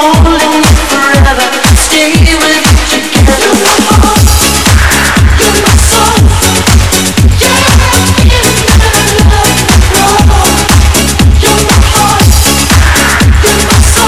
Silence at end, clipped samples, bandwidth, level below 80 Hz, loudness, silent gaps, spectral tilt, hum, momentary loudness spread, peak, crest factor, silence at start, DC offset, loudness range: 0 s; 6%; 18.5 kHz; -10 dBFS; -5 LUFS; none; -3.5 dB/octave; none; 1 LU; 0 dBFS; 6 dB; 0 s; 4%; 0 LU